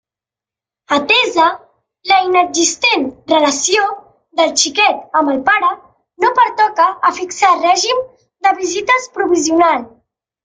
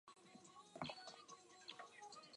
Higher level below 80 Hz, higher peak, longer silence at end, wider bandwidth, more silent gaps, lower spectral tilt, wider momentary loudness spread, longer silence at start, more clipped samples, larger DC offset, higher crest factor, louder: first, -58 dBFS vs -88 dBFS; first, 0 dBFS vs -32 dBFS; first, 0.55 s vs 0 s; about the same, 10 kHz vs 11 kHz; neither; second, -0.5 dB/octave vs -3 dB/octave; second, 7 LU vs 12 LU; first, 0.9 s vs 0.05 s; neither; neither; second, 14 dB vs 28 dB; first, -13 LUFS vs -57 LUFS